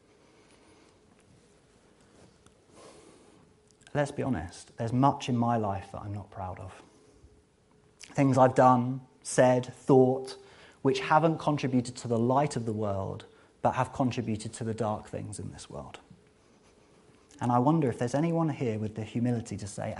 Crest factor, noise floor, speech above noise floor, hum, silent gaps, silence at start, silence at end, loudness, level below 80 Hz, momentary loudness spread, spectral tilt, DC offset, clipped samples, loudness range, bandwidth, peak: 22 dB; -63 dBFS; 35 dB; none; none; 2.8 s; 0 s; -28 LUFS; -62 dBFS; 17 LU; -6.5 dB/octave; under 0.1%; under 0.1%; 10 LU; 11.5 kHz; -8 dBFS